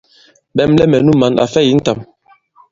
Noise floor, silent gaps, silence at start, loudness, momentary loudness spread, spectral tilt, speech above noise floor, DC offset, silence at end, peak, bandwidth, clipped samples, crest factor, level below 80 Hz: -50 dBFS; none; 0.55 s; -12 LUFS; 10 LU; -6.5 dB/octave; 39 dB; under 0.1%; 0.7 s; 0 dBFS; 7.6 kHz; under 0.1%; 14 dB; -42 dBFS